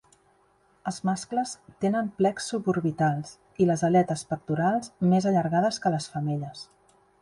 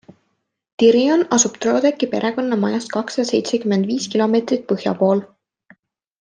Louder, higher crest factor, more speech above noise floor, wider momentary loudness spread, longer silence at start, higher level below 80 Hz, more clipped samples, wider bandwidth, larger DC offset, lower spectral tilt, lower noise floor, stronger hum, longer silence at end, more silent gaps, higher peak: second, -26 LUFS vs -18 LUFS; about the same, 18 dB vs 16 dB; second, 38 dB vs 54 dB; first, 12 LU vs 7 LU; about the same, 0.85 s vs 0.8 s; about the same, -64 dBFS vs -64 dBFS; neither; first, 11.5 kHz vs 10 kHz; neither; first, -6.5 dB/octave vs -4.5 dB/octave; second, -64 dBFS vs -71 dBFS; neither; second, 0.6 s vs 0.95 s; neither; second, -8 dBFS vs -2 dBFS